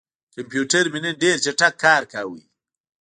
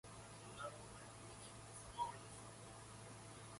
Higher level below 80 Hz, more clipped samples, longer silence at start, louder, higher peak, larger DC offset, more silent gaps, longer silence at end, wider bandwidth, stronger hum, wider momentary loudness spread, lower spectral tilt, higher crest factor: about the same, -70 dBFS vs -70 dBFS; neither; first, 0.35 s vs 0.05 s; first, -19 LUFS vs -53 LUFS; first, -2 dBFS vs -32 dBFS; neither; neither; first, 0.7 s vs 0 s; about the same, 10.5 kHz vs 11.5 kHz; neither; first, 14 LU vs 9 LU; about the same, -2.5 dB/octave vs -3.5 dB/octave; about the same, 20 dB vs 22 dB